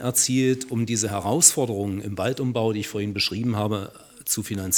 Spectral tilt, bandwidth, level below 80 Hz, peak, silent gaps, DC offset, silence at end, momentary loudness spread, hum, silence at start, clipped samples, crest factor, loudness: -3.5 dB/octave; 19.5 kHz; -62 dBFS; -2 dBFS; none; under 0.1%; 0 s; 12 LU; none; 0 s; under 0.1%; 22 dB; -23 LUFS